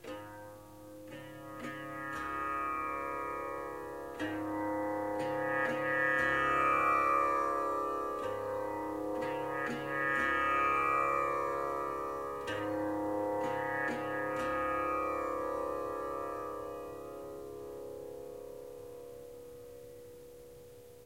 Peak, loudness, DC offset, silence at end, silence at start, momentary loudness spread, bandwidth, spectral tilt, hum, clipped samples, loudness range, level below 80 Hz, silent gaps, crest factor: -20 dBFS; -34 LUFS; under 0.1%; 0 s; 0 s; 20 LU; 16 kHz; -5 dB/octave; none; under 0.1%; 13 LU; -62 dBFS; none; 16 dB